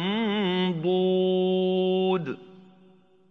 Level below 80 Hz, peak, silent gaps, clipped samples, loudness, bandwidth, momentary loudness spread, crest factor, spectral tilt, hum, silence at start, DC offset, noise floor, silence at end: -76 dBFS; -14 dBFS; none; under 0.1%; -25 LUFS; 4.7 kHz; 5 LU; 10 dB; -8.5 dB/octave; none; 0 s; under 0.1%; -57 dBFS; 0.75 s